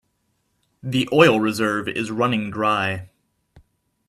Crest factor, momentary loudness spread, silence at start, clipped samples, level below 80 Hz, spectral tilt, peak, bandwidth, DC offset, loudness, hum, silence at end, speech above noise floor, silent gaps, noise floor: 22 dB; 11 LU; 0.85 s; under 0.1%; -60 dBFS; -5.5 dB/octave; 0 dBFS; 15 kHz; under 0.1%; -20 LUFS; none; 0.5 s; 50 dB; none; -70 dBFS